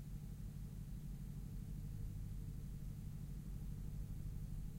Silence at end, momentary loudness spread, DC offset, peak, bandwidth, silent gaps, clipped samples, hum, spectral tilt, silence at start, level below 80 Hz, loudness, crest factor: 0 s; 2 LU; under 0.1%; -34 dBFS; 16 kHz; none; under 0.1%; none; -7.5 dB/octave; 0 s; -50 dBFS; -50 LUFS; 12 dB